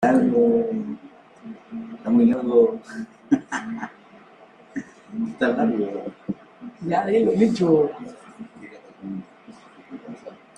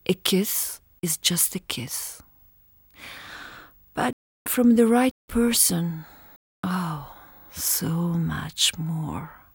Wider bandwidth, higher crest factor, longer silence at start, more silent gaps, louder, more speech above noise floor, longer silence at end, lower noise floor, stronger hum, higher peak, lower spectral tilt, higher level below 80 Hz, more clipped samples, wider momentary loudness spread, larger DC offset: second, 9.4 kHz vs over 20 kHz; second, 18 dB vs 24 dB; about the same, 0 s vs 0.1 s; second, none vs 4.13-4.45 s, 5.11-5.28 s, 6.36-6.63 s; about the same, -22 LUFS vs -23 LUFS; second, 29 dB vs 33 dB; about the same, 0.25 s vs 0.2 s; second, -50 dBFS vs -57 dBFS; neither; second, -6 dBFS vs -2 dBFS; first, -7.5 dB/octave vs -3.5 dB/octave; second, -64 dBFS vs -52 dBFS; neither; about the same, 23 LU vs 21 LU; neither